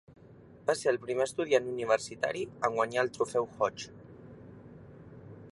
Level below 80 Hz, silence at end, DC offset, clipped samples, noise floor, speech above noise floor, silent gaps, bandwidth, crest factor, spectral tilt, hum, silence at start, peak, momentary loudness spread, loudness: -66 dBFS; 0.05 s; under 0.1%; under 0.1%; -54 dBFS; 24 dB; none; 11.5 kHz; 22 dB; -4 dB/octave; none; 0.1 s; -12 dBFS; 22 LU; -31 LUFS